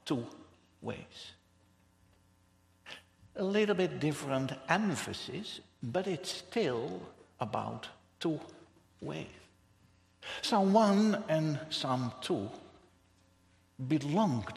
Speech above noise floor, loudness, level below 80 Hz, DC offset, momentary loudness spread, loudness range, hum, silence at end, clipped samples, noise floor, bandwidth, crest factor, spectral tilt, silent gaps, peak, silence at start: 35 dB; -33 LUFS; -72 dBFS; under 0.1%; 20 LU; 10 LU; none; 0 s; under 0.1%; -68 dBFS; 13.5 kHz; 24 dB; -5.5 dB/octave; none; -12 dBFS; 0.05 s